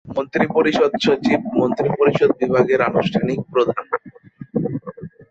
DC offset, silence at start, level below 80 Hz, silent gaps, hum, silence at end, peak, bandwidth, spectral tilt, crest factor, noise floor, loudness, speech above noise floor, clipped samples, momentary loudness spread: under 0.1%; 0.05 s; -54 dBFS; none; none; 0.05 s; -2 dBFS; 8 kHz; -6.5 dB/octave; 16 dB; -40 dBFS; -19 LUFS; 22 dB; under 0.1%; 11 LU